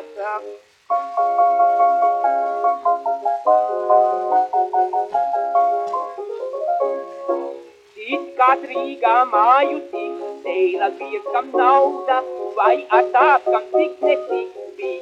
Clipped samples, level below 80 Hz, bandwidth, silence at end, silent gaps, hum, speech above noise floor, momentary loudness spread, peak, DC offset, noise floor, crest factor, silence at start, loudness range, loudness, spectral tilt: under 0.1%; -76 dBFS; 7.4 kHz; 0 s; none; none; 21 dB; 13 LU; -2 dBFS; under 0.1%; -39 dBFS; 16 dB; 0 s; 4 LU; -19 LUFS; -3.5 dB/octave